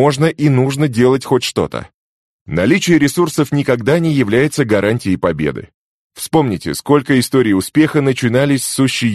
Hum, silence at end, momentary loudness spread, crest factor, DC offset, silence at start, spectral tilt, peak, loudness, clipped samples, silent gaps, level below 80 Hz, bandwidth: none; 0 s; 7 LU; 14 dB; under 0.1%; 0 s; -5.5 dB/octave; 0 dBFS; -14 LUFS; under 0.1%; 1.94-2.46 s, 5.74-6.10 s; -46 dBFS; 13 kHz